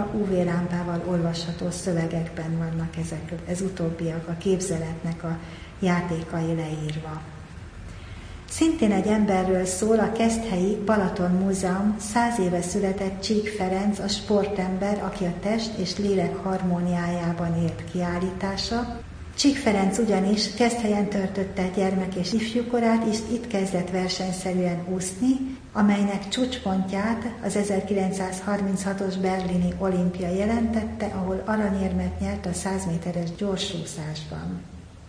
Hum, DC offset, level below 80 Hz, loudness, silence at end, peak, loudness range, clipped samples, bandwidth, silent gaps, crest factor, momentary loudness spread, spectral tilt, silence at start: none; under 0.1%; -44 dBFS; -25 LUFS; 0 s; -8 dBFS; 5 LU; under 0.1%; 10.5 kHz; none; 16 dB; 9 LU; -5.5 dB/octave; 0 s